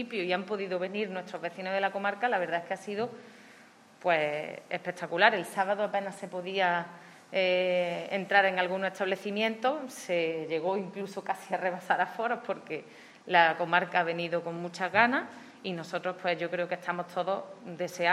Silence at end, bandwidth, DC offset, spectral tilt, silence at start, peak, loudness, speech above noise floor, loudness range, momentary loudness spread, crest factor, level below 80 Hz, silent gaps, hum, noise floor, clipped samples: 0 s; 14.5 kHz; under 0.1%; -4.5 dB/octave; 0 s; -6 dBFS; -30 LUFS; 26 dB; 4 LU; 13 LU; 24 dB; -86 dBFS; none; none; -56 dBFS; under 0.1%